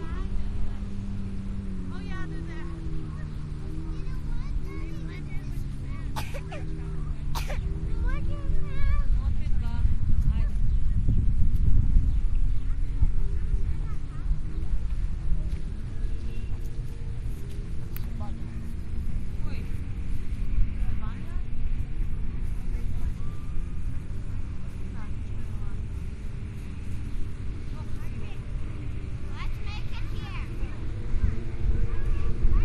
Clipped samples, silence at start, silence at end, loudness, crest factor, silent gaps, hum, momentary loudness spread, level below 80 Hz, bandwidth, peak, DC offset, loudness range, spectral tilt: under 0.1%; 0 s; 0 s; -33 LUFS; 18 dB; none; none; 9 LU; -28 dBFS; 6.2 kHz; -6 dBFS; under 0.1%; 8 LU; -7.5 dB/octave